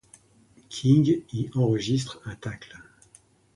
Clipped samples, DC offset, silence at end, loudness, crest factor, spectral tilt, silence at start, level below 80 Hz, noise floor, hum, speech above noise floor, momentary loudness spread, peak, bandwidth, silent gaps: under 0.1%; under 0.1%; 0.75 s; -25 LUFS; 20 dB; -7 dB/octave; 0.7 s; -58 dBFS; -58 dBFS; none; 34 dB; 18 LU; -8 dBFS; 11.5 kHz; none